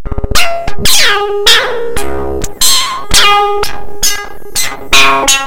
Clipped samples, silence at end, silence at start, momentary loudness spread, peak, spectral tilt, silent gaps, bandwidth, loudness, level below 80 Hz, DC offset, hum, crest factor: 3%; 0 s; 0 s; 12 LU; 0 dBFS; -1 dB/octave; none; over 20 kHz; -9 LUFS; -24 dBFS; under 0.1%; none; 8 dB